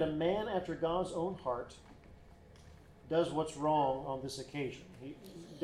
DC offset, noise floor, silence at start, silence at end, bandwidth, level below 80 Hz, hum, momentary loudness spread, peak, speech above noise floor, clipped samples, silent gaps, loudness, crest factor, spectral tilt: under 0.1%; -57 dBFS; 0 s; 0 s; 13.5 kHz; -60 dBFS; none; 18 LU; -20 dBFS; 21 dB; under 0.1%; none; -36 LUFS; 18 dB; -6 dB/octave